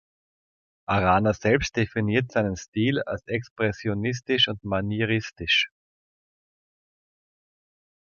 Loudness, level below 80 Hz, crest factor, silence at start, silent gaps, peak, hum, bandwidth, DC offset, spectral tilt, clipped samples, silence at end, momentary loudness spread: -24 LUFS; -48 dBFS; 22 dB; 0.9 s; 2.68-2.73 s, 3.51-3.56 s; -6 dBFS; none; 7.2 kHz; under 0.1%; -5 dB/octave; under 0.1%; 2.4 s; 7 LU